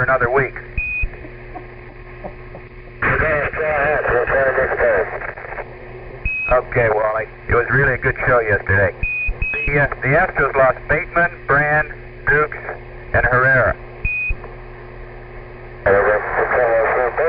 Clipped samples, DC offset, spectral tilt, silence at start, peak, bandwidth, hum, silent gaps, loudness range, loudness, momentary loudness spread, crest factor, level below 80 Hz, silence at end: under 0.1%; under 0.1%; -11.5 dB/octave; 0 s; -2 dBFS; 5.2 kHz; none; none; 4 LU; -17 LUFS; 21 LU; 16 dB; -32 dBFS; 0 s